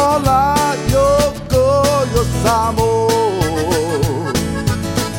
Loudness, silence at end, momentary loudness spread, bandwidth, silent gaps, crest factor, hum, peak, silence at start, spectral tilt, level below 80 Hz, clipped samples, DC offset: -15 LUFS; 0 s; 5 LU; 17 kHz; none; 14 dB; none; 0 dBFS; 0 s; -5 dB/octave; -28 dBFS; under 0.1%; under 0.1%